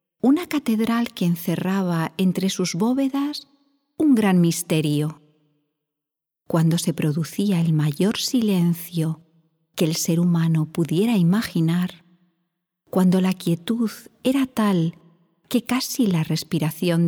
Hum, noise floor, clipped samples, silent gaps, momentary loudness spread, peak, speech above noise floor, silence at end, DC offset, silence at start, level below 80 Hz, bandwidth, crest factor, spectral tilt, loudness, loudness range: none; -86 dBFS; under 0.1%; none; 7 LU; -6 dBFS; 65 dB; 0 s; under 0.1%; 0.25 s; -64 dBFS; 20 kHz; 16 dB; -6 dB/octave; -22 LUFS; 2 LU